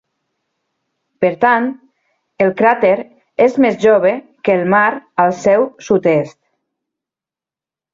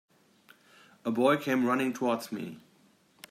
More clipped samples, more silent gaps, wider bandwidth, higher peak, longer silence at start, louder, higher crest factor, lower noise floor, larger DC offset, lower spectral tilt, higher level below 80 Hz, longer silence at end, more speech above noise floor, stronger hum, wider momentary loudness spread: neither; neither; second, 7.6 kHz vs 16 kHz; first, 0 dBFS vs -12 dBFS; first, 1.2 s vs 1.05 s; first, -14 LUFS vs -29 LUFS; about the same, 16 dB vs 20 dB; first, -89 dBFS vs -64 dBFS; neither; about the same, -6.5 dB/octave vs -5.5 dB/octave; first, -58 dBFS vs -80 dBFS; first, 1.65 s vs 0.7 s; first, 76 dB vs 36 dB; neither; second, 7 LU vs 13 LU